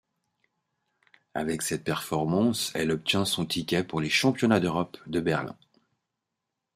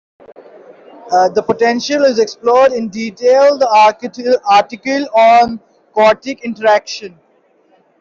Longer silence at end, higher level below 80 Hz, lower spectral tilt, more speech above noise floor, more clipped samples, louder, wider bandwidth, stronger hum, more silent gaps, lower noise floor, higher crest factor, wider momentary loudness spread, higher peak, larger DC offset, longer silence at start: first, 1.25 s vs 0.9 s; about the same, -62 dBFS vs -58 dBFS; about the same, -4.5 dB/octave vs -3.5 dB/octave; first, 58 dB vs 42 dB; neither; second, -27 LUFS vs -12 LUFS; first, 15.5 kHz vs 7.6 kHz; neither; neither; first, -85 dBFS vs -53 dBFS; first, 20 dB vs 12 dB; second, 8 LU vs 12 LU; second, -8 dBFS vs -2 dBFS; neither; first, 1.35 s vs 1.05 s